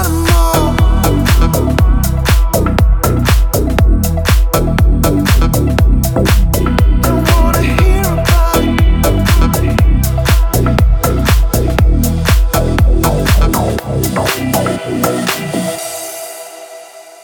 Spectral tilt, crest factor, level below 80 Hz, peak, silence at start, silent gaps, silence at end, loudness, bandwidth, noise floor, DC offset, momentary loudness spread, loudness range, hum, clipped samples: -5.5 dB/octave; 10 dB; -12 dBFS; 0 dBFS; 0 s; none; 0.1 s; -12 LUFS; over 20 kHz; -33 dBFS; under 0.1%; 5 LU; 2 LU; none; under 0.1%